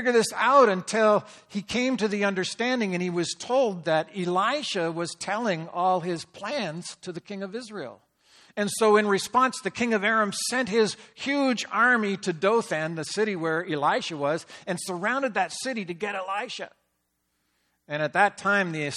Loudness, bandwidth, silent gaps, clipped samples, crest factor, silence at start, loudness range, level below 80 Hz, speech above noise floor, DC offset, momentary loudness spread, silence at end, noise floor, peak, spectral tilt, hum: -25 LUFS; 14.5 kHz; none; under 0.1%; 20 dB; 0 s; 6 LU; -70 dBFS; 50 dB; under 0.1%; 14 LU; 0 s; -75 dBFS; -6 dBFS; -4 dB/octave; none